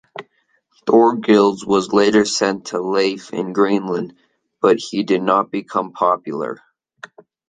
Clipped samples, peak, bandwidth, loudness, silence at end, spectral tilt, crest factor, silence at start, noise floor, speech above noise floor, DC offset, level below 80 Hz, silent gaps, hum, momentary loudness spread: under 0.1%; -2 dBFS; 9.6 kHz; -17 LUFS; 0.95 s; -5 dB/octave; 16 dB; 0.15 s; -63 dBFS; 47 dB; under 0.1%; -62 dBFS; none; none; 12 LU